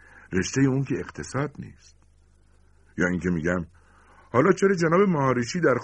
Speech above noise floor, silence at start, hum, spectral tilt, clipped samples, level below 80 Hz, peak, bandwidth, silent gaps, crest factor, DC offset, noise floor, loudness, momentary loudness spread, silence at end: 34 dB; 0.3 s; none; -6 dB/octave; under 0.1%; -52 dBFS; -4 dBFS; 10 kHz; none; 20 dB; under 0.1%; -57 dBFS; -24 LUFS; 12 LU; 0 s